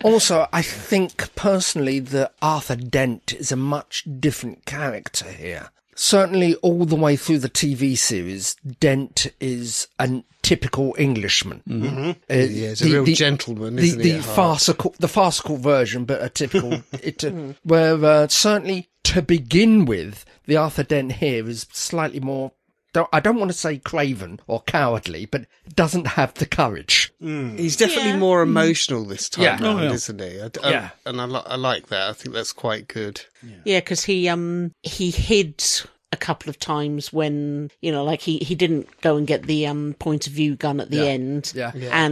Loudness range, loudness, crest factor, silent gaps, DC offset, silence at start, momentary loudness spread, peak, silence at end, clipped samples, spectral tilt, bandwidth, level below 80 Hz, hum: 5 LU; -20 LUFS; 20 dB; none; under 0.1%; 0 s; 11 LU; -2 dBFS; 0 s; under 0.1%; -4 dB/octave; 14 kHz; -44 dBFS; none